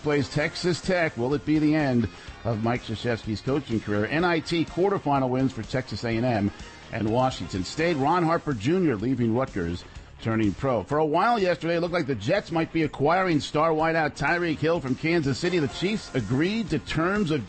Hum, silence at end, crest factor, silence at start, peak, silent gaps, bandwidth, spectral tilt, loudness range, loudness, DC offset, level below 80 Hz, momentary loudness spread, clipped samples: none; 0 s; 12 dB; 0 s; -12 dBFS; none; 8.8 kHz; -6.5 dB/octave; 2 LU; -25 LUFS; under 0.1%; -48 dBFS; 7 LU; under 0.1%